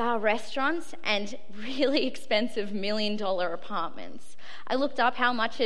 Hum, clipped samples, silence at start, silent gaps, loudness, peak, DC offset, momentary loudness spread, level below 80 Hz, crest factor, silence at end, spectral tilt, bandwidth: none; under 0.1%; 0 s; none; -28 LUFS; -8 dBFS; 3%; 14 LU; -70 dBFS; 20 dB; 0 s; -4 dB/octave; 13 kHz